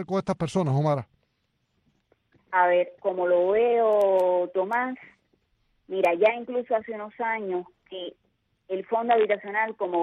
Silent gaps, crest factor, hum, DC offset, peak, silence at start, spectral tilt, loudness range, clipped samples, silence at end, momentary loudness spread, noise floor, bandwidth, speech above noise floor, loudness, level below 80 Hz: none; 18 dB; none; under 0.1%; -8 dBFS; 0 s; -7 dB/octave; 5 LU; under 0.1%; 0 s; 13 LU; -74 dBFS; 10.5 kHz; 49 dB; -25 LUFS; -66 dBFS